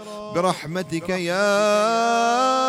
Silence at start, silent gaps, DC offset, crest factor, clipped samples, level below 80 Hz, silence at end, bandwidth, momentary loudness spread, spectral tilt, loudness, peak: 0 s; none; under 0.1%; 14 dB; under 0.1%; -62 dBFS; 0 s; 16 kHz; 9 LU; -4 dB/octave; -21 LUFS; -8 dBFS